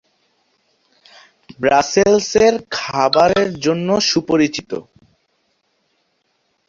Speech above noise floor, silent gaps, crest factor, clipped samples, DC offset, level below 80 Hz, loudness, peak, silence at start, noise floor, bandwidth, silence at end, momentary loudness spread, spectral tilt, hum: 51 dB; none; 18 dB; under 0.1%; under 0.1%; -50 dBFS; -15 LUFS; 0 dBFS; 1.6 s; -66 dBFS; 7.6 kHz; 1.85 s; 9 LU; -4 dB/octave; none